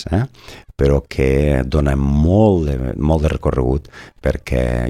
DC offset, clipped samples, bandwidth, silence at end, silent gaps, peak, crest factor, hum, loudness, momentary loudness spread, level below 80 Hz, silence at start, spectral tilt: under 0.1%; under 0.1%; 12.5 kHz; 0 s; none; -2 dBFS; 14 dB; none; -17 LUFS; 9 LU; -24 dBFS; 0 s; -8 dB/octave